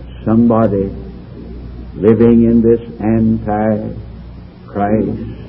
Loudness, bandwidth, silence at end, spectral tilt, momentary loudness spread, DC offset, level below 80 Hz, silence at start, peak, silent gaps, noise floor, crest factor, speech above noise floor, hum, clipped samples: -13 LUFS; 3.5 kHz; 0 s; -12.5 dB/octave; 22 LU; under 0.1%; -32 dBFS; 0 s; 0 dBFS; none; -33 dBFS; 14 dB; 20 dB; none; under 0.1%